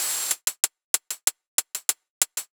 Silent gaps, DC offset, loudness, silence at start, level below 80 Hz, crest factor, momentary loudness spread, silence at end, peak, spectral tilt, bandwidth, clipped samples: 0.84-0.94 s, 1.47-1.58 s, 2.10-2.21 s; under 0.1%; -25 LUFS; 0 s; -80 dBFS; 26 dB; 3 LU; 0.1 s; -2 dBFS; 3.5 dB/octave; over 20 kHz; under 0.1%